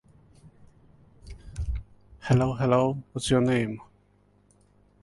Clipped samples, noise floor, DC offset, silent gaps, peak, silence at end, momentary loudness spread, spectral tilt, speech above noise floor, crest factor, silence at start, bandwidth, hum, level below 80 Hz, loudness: under 0.1%; -63 dBFS; under 0.1%; none; -8 dBFS; 1.2 s; 19 LU; -6.5 dB/octave; 39 dB; 20 dB; 0.45 s; 11.5 kHz; 50 Hz at -55 dBFS; -42 dBFS; -26 LUFS